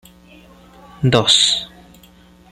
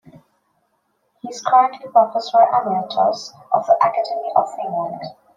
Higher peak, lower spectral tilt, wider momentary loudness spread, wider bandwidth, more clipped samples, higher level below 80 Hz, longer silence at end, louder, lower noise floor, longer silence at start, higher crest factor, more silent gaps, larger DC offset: about the same, 0 dBFS vs -2 dBFS; second, -3 dB/octave vs -4.5 dB/octave; about the same, 11 LU vs 13 LU; first, 14.5 kHz vs 7.6 kHz; neither; first, -50 dBFS vs -74 dBFS; first, 0.85 s vs 0.25 s; first, -14 LUFS vs -18 LUFS; second, -47 dBFS vs -67 dBFS; first, 1 s vs 0.15 s; about the same, 20 dB vs 18 dB; neither; neither